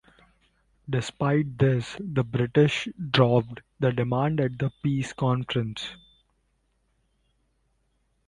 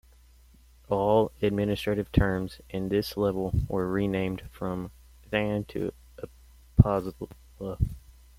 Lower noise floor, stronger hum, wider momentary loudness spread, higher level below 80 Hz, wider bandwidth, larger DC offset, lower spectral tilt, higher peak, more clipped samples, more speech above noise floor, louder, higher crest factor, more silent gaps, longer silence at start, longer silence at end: first, -71 dBFS vs -56 dBFS; neither; second, 8 LU vs 19 LU; second, -56 dBFS vs -40 dBFS; second, 11 kHz vs 16 kHz; neither; about the same, -7 dB/octave vs -8 dB/octave; second, -6 dBFS vs -2 dBFS; neither; first, 46 dB vs 28 dB; about the same, -26 LUFS vs -28 LUFS; second, 20 dB vs 26 dB; neither; about the same, 0.85 s vs 0.9 s; first, 2.35 s vs 0.25 s